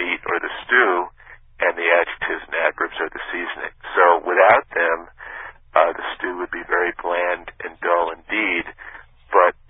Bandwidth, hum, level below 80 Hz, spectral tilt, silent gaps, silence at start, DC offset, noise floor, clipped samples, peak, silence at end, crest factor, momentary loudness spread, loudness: 3.9 kHz; none; -54 dBFS; -7.5 dB/octave; none; 0 s; under 0.1%; -46 dBFS; under 0.1%; 0 dBFS; 0.15 s; 20 dB; 15 LU; -20 LUFS